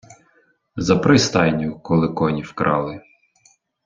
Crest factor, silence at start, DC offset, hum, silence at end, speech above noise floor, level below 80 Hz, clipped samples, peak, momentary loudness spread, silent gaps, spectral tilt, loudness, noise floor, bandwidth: 18 dB; 0.1 s; under 0.1%; none; 0.85 s; 42 dB; -50 dBFS; under 0.1%; -2 dBFS; 13 LU; none; -5.5 dB/octave; -19 LUFS; -60 dBFS; 7.6 kHz